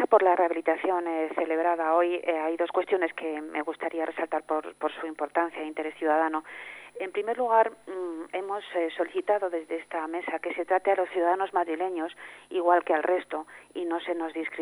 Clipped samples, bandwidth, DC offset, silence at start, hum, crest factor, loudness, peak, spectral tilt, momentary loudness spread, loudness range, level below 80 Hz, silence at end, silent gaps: under 0.1%; 10.5 kHz; under 0.1%; 0 s; 50 Hz at -75 dBFS; 20 dB; -28 LUFS; -8 dBFS; -4.5 dB/octave; 10 LU; 3 LU; -78 dBFS; 0 s; none